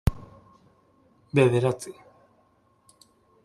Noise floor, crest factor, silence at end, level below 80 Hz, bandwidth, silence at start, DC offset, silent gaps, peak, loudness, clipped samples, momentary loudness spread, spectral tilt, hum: -64 dBFS; 22 dB; 1.55 s; -42 dBFS; 13.5 kHz; 0.05 s; under 0.1%; none; -6 dBFS; -24 LUFS; under 0.1%; 21 LU; -7 dB/octave; none